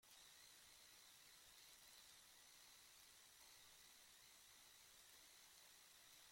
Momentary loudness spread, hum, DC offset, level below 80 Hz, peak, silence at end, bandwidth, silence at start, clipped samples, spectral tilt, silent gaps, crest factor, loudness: 1 LU; none; under 0.1%; -90 dBFS; -48 dBFS; 0 s; 16.5 kHz; 0 s; under 0.1%; 0.5 dB/octave; none; 20 dB; -65 LUFS